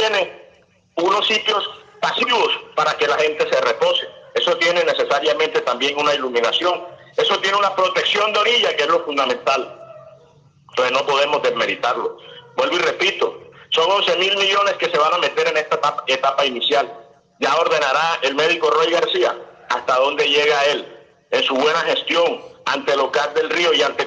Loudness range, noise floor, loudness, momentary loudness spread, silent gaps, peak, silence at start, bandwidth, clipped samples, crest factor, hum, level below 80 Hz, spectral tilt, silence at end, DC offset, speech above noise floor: 2 LU; -53 dBFS; -18 LUFS; 8 LU; none; -4 dBFS; 0 s; 9.6 kHz; under 0.1%; 16 dB; none; -70 dBFS; -2 dB/octave; 0 s; under 0.1%; 35 dB